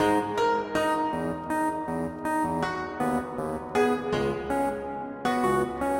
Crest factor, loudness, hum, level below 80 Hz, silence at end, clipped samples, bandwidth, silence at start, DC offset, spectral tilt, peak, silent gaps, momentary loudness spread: 16 dB; -28 LUFS; none; -52 dBFS; 0 s; under 0.1%; 16 kHz; 0 s; under 0.1%; -5.5 dB/octave; -12 dBFS; none; 6 LU